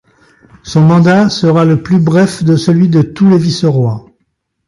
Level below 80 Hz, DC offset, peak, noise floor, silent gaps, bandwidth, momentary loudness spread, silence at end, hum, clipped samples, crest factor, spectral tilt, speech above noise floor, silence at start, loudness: -44 dBFS; under 0.1%; 0 dBFS; -65 dBFS; none; 11.5 kHz; 6 LU; 0.65 s; none; under 0.1%; 10 dB; -7 dB/octave; 56 dB; 0.65 s; -10 LUFS